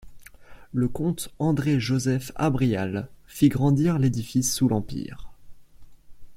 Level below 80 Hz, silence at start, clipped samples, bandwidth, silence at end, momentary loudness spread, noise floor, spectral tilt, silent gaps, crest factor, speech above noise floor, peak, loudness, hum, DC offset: -48 dBFS; 0.05 s; under 0.1%; 16.5 kHz; 0 s; 12 LU; -45 dBFS; -6 dB/octave; none; 18 dB; 21 dB; -6 dBFS; -24 LUFS; none; under 0.1%